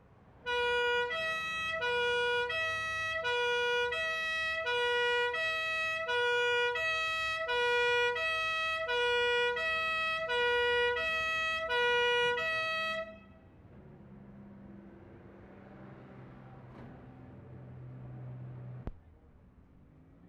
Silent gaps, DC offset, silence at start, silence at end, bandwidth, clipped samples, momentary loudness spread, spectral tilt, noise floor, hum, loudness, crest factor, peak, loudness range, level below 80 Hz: none; under 0.1%; 0.4 s; 0 s; 13 kHz; under 0.1%; 23 LU; -2.5 dB/octave; -59 dBFS; none; -31 LUFS; 12 dB; -20 dBFS; 20 LU; -60 dBFS